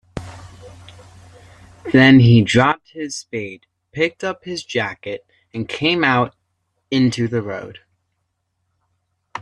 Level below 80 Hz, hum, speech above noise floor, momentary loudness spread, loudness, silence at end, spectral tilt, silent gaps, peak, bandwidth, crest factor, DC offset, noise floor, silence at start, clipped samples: -50 dBFS; none; 56 dB; 23 LU; -17 LUFS; 0 s; -6 dB/octave; none; 0 dBFS; 10.5 kHz; 18 dB; under 0.1%; -72 dBFS; 0.15 s; under 0.1%